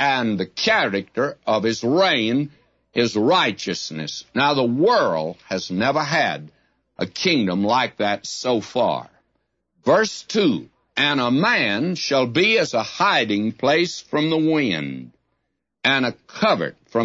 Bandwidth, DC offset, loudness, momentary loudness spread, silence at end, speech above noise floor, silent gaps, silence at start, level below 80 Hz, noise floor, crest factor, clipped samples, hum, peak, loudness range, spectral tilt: 8 kHz; under 0.1%; -20 LUFS; 9 LU; 0 s; 55 dB; none; 0 s; -64 dBFS; -76 dBFS; 16 dB; under 0.1%; none; -4 dBFS; 3 LU; -4.5 dB/octave